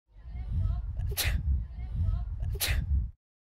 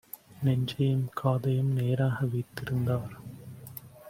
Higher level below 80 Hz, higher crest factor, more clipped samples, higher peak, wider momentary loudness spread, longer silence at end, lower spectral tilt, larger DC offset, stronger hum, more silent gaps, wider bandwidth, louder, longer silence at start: first, -32 dBFS vs -60 dBFS; about the same, 16 dB vs 16 dB; neither; second, -16 dBFS vs -12 dBFS; second, 9 LU vs 17 LU; first, 0.35 s vs 0 s; second, -4 dB/octave vs -8 dB/octave; neither; neither; neither; about the same, 16 kHz vs 16.5 kHz; second, -33 LUFS vs -29 LUFS; second, 0.15 s vs 0.3 s